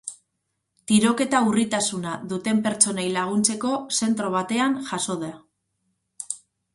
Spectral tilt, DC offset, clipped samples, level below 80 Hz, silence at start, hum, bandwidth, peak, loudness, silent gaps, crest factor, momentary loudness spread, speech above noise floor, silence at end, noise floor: -3.5 dB/octave; under 0.1%; under 0.1%; -66 dBFS; 0.05 s; none; 11.5 kHz; -2 dBFS; -23 LUFS; none; 22 dB; 14 LU; 55 dB; 0.4 s; -77 dBFS